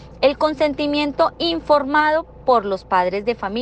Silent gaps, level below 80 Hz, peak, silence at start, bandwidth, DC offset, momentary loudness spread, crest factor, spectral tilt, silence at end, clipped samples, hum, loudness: none; -46 dBFS; -4 dBFS; 0 s; 8.8 kHz; under 0.1%; 5 LU; 14 dB; -5.5 dB/octave; 0 s; under 0.1%; none; -19 LUFS